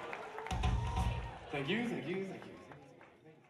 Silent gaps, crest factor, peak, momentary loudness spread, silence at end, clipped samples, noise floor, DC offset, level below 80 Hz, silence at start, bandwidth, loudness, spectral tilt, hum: none; 16 dB; -24 dBFS; 20 LU; 0.1 s; under 0.1%; -60 dBFS; under 0.1%; -44 dBFS; 0 s; 13 kHz; -39 LUFS; -6 dB/octave; none